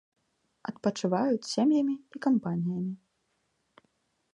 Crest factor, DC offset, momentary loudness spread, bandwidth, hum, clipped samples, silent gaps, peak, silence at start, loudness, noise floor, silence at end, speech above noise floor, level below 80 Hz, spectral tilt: 18 dB; under 0.1%; 14 LU; 10.5 kHz; none; under 0.1%; none; -14 dBFS; 0.65 s; -29 LUFS; -76 dBFS; 1.4 s; 48 dB; -76 dBFS; -6.5 dB/octave